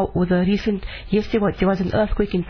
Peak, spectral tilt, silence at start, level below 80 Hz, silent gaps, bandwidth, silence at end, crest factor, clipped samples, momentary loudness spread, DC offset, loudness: -6 dBFS; -8.5 dB/octave; 0 s; -32 dBFS; none; 5.4 kHz; 0 s; 14 dB; under 0.1%; 4 LU; under 0.1%; -21 LUFS